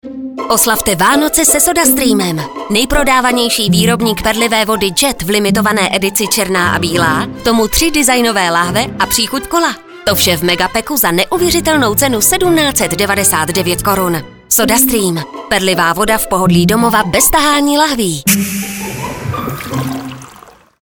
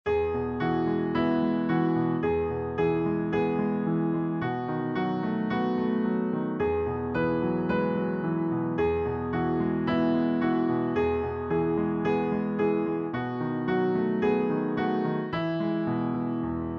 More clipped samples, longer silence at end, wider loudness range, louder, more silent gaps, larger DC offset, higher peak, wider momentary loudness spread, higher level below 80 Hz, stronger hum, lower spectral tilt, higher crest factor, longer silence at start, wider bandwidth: neither; first, 0.5 s vs 0 s; about the same, 2 LU vs 1 LU; first, -11 LUFS vs -27 LUFS; neither; neither; first, 0 dBFS vs -12 dBFS; first, 10 LU vs 4 LU; first, -34 dBFS vs -52 dBFS; neither; second, -3 dB/octave vs -9.5 dB/octave; about the same, 12 dB vs 14 dB; about the same, 0.05 s vs 0.05 s; first, over 20 kHz vs 5.8 kHz